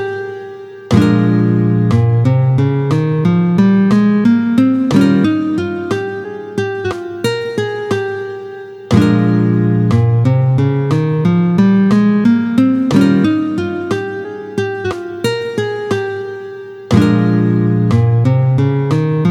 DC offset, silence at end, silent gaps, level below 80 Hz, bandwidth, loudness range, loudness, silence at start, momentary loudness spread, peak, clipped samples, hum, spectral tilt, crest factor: under 0.1%; 0 s; none; -46 dBFS; 11.5 kHz; 6 LU; -14 LUFS; 0 s; 12 LU; 0 dBFS; under 0.1%; none; -8 dB/octave; 12 dB